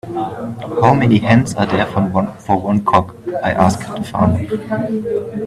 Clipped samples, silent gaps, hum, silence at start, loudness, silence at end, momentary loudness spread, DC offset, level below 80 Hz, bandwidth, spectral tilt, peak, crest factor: under 0.1%; none; none; 0.05 s; -16 LUFS; 0 s; 11 LU; under 0.1%; -44 dBFS; 13 kHz; -7 dB/octave; 0 dBFS; 16 dB